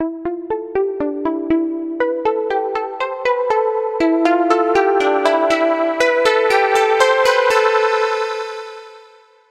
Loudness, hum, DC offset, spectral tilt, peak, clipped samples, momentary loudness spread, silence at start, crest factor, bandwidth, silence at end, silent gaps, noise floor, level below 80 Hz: -16 LUFS; none; under 0.1%; -3 dB/octave; 0 dBFS; under 0.1%; 9 LU; 0 s; 16 dB; 14.5 kHz; 0.5 s; none; -47 dBFS; -54 dBFS